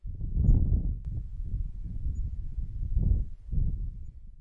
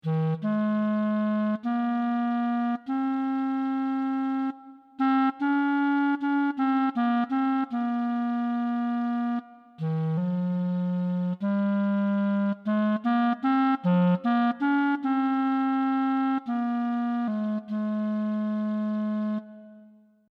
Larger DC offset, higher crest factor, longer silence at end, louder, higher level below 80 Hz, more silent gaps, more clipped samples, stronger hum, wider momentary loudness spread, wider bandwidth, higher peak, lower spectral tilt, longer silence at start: neither; about the same, 18 dB vs 14 dB; second, 0 s vs 0.45 s; second, -33 LUFS vs -26 LUFS; first, -30 dBFS vs -84 dBFS; neither; neither; neither; first, 12 LU vs 5 LU; second, 1 kHz vs 5.2 kHz; about the same, -12 dBFS vs -12 dBFS; first, -12 dB/octave vs -9.5 dB/octave; about the same, 0.05 s vs 0.05 s